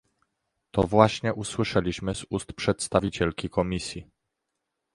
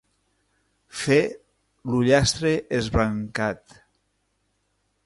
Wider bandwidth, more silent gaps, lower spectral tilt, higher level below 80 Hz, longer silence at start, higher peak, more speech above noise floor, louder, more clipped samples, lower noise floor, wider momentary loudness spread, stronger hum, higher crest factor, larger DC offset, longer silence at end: about the same, 11.5 kHz vs 11.5 kHz; neither; about the same, -5.5 dB/octave vs -5 dB/octave; about the same, -48 dBFS vs -44 dBFS; second, 0.75 s vs 0.95 s; first, -2 dBFS vs -6 dBFS; first, 56 dB vs 49 dB; second, -26 LUFS vs -23 LUFS; neither; first, -82 dBFS vs -72 dBFS; second, 11 LU vs 14 LU; second, none vs 50 Hz at -55 dBFS; first, 26 dB vs 20 dB; neither; second, 0.9 s vs 1.5 s